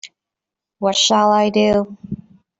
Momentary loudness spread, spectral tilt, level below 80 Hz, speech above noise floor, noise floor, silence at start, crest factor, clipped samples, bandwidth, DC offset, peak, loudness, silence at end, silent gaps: 19 LU; -3.5 dB/octave; -52 dBFS; 70 dB; -85 dBFS; 0.05 s; 16 dB; under 0.1%; 8.4 kHz; under 0.1%; -4 dBFS; -15 LUFS; 0.45 s; none